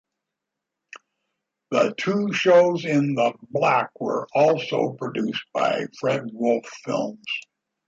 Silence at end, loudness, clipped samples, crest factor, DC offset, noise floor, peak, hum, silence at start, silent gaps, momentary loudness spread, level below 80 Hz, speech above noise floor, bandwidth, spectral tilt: 0.45 s; -23 LUFS; under 0.1%; 18 dB; under 0.1%; -84 dBFS; -4 dBFS; none; 0.95 s; none; 10 LU; -72 dBFS; 62 dB; 7.8 kHz; -5.5 dB/octave